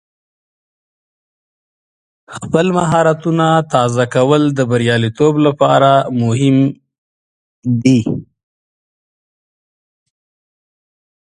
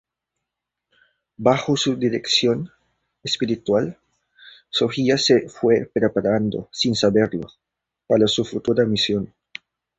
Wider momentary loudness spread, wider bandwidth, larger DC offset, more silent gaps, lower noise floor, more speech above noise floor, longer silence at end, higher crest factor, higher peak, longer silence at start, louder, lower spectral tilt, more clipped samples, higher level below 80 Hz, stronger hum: second, 8 LU vs 13 LU; first, 11 kHz vs 8.2 kHz; neither; first, 6.98-7.62 s vs none; first, under -90 dBFS vs -83 dBFS; first, over 78 dB vs 63 dB; first, 3 s vs 0.7 s; about the same, 16 dB vs 20 dB; about the same, 0 dBFS vs -2 dBFS; first, 2.3 s vs 1.4 s; first, -13 LUFS vs -20 LUFS; first, -6.5 dB/octave vs -5 dB/octave; neither; about the same, -52 dBFS vs -56 dBFS; neither